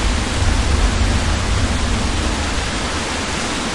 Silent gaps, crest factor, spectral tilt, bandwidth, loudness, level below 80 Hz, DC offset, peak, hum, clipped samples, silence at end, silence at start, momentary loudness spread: none; 14 dB; -4 dB/octave; 11.5 kHz; -19 LUFS; -22 dBFS; under 0.1%; -4 dBFS; none; under 0.1%; 0 s; 0 s; 3 LU